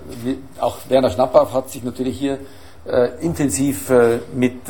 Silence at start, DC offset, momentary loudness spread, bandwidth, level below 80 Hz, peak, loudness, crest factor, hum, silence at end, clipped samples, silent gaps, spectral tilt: 0 s; 1%; 11 LU; 17.5 kHz; -46 dBFS; 0 dBFS; -19 LUFS; 18 dB; none; 0 s; under 0.1%; none; -5.5 dB/octave